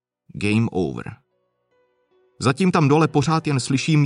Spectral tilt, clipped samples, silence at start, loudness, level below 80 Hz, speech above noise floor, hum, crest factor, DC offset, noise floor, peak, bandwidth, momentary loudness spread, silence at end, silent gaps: -6 dB/octave; under 0.1%; 0.35 s; -20 LUFS; -54 dBFS; 51 dB; none; 18 dB; under 0.1%; -70 dBFS; -4 dBFS; 11 kHz; 13 LU; 0 s; none